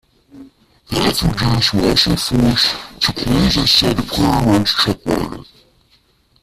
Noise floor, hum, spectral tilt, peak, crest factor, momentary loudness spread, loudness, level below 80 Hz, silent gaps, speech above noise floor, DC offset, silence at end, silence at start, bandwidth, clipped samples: -56 dBFS; none; -4.5 dB/octave; 0 dBFS; 16 dB; 8 LU; -15 LUFS; -32 dBFS; none; 41 dB; under 0.1%; 1 s; 0.35 s; 15.5 kHz; under 0.1%